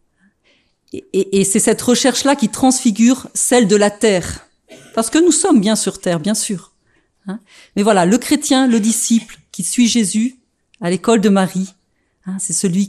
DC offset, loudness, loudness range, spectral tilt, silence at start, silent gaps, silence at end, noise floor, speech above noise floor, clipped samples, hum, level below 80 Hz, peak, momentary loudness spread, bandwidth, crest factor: under 0.1%; -15 LUFS; 3 LU; -4 dB/octave; 0.95 s; none; 0 s; -60 dBFS; 45 dB; under 0.1%; none; -50 dBFS; 0 dBFS; 16 LU; 14 kHz; 16 dB